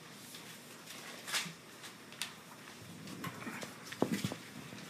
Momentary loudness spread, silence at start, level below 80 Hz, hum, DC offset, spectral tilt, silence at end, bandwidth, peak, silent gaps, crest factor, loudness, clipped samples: 13 LU; 0 s; -78 dBFS; none; under 0.1%; -3.5 dB/octave; 0 s; 15.5 kHz; -16 dBFS; none; 28 dB; -43 LUFS; under 0.1%